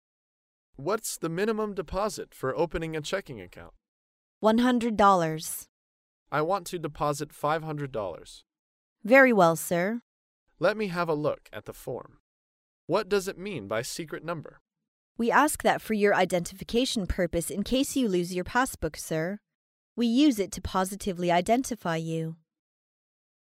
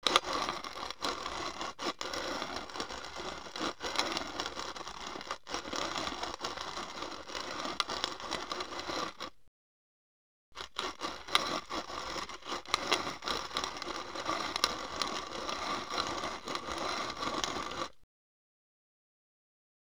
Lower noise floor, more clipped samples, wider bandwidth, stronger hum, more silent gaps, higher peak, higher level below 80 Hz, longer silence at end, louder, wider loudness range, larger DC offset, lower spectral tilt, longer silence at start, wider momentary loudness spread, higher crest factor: about the same, under -90 dBFS vs under -90 dBFS; neither; second, 16 kHz vs over 20 kHz; neither; first, 3.88-4.41 s, 5.69-6.26 s, 8.59-8.96 s, 10.02-10.46 s, 12.20-12.88 s, 14.61-14.66 s, 14.88-15.15 s, 19.55-19.96 s vs 9.48-10.52 s; about the same, -6 dBFS vs -4 dBFS; first, -52 dBFS vs -62 dBFS; second, 1.1 s vs 2.1 s; first, -27 LUFS vs -36 LUFS; first, 7 LU vs 4 LU; second, under 0.1% vs 0.2%; first, -4.5 dB/octave vs -1.5 dB/octave; first, 0.8 s vs 0.05 s; first, 15 LU vs 9 LU; second, 22 dB vs 34 dB